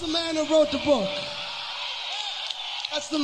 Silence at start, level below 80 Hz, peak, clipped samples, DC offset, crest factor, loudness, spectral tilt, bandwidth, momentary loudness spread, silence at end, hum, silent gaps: 0 s; -58 dBFS; -10 dBFS; under 0.1%; under 0.1%; 18 dB; -26 LUFS; -3 dB/octave; 11 kHz; 9 LU; 0 s; none; none